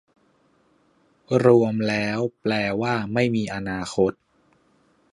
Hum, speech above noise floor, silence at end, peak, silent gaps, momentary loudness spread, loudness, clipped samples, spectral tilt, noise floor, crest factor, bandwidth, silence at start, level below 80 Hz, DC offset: none; 41 dB; 1 s; -2 dBFS; none; 9 LU; -22 LUFS; under 0.1%; -6.5 dB/octave; -62 dBFS; 22 dB; 11.5 kHz; 1.3 s; -56 dBFS; under 0.1%